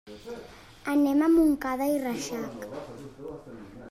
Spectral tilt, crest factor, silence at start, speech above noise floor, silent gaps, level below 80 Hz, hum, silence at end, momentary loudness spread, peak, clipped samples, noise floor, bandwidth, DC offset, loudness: -5 dB/octave; 14 dB; 0.05 s; 21 dB; none; -54 dBFS; none; 0 s; 22 LU; -14 dBFS; under 0.1%; -47 dBFS; 15 kHz; under 0.1%; -26 LUFS